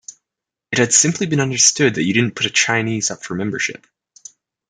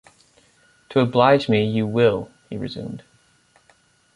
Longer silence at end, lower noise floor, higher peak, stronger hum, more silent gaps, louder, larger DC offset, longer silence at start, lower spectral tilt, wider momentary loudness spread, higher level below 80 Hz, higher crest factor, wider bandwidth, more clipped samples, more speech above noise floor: second, 0.95 s vs 1.2 s; first, -85 dBFS vs -59 dBFS; about the same, 0 dBFS vs -2 dBFS; neither; neither; first, -16 LUFS vs -20 LUFS; neither; second, 0.1 s vs 0.9 s; second, -2.5 dB/octave vs -7.5 dB/octave; second, 10 LU vs 18 LU; about the same, -60 dBFS vs -56 dBFS; about the same, 20 dB vs 20 dB; about the same, 11 kHz vs 11 kHz; neither; first, 67 dB vs 40 dB